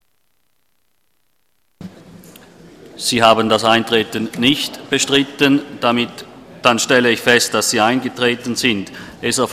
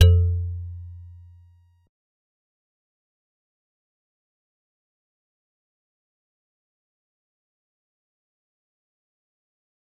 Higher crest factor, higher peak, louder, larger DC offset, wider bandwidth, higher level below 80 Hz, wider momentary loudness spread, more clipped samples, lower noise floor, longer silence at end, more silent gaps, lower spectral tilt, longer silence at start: second, 18 dB vs 28 dB; about the same, 0 dBFS vs -2 dBFS; first, -15 LUFS vs -23 LUFS; neither; first, 15.5 kHz vs 6.2 kHz; second, -52 dBFS vs -44 dBFS; second, 9 LU vs 25 LU; neither; first, -67 dBFS vs -55 dBFS; second, 0 s vs 8.95 s; neither; second, -3 dB/octave vs -6 dB/octave; first, 1.8 s vs 0 s